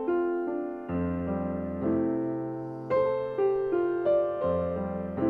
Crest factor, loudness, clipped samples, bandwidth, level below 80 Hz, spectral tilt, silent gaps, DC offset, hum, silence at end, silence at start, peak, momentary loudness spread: 14 dB; -29 LUFS; under 0.1%; 4.6 kHz; -54 dBFS; -10.5 dB/octave; none; under 0.1%; none; 0 s; 0 s; -16 dBFS; 7 LU